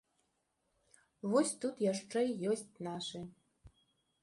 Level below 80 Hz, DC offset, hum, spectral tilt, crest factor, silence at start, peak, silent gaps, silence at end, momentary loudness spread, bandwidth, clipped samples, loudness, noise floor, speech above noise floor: -74 dBFS; under 0.1%; none; -4.5 dB/octave; 20 dB; 1.25 s; -20 dBFS; none; 0.55 s; 12 LU; 11.5 kHz; under 0.1%; -36 LUFS; -81 dBFS; 45 dB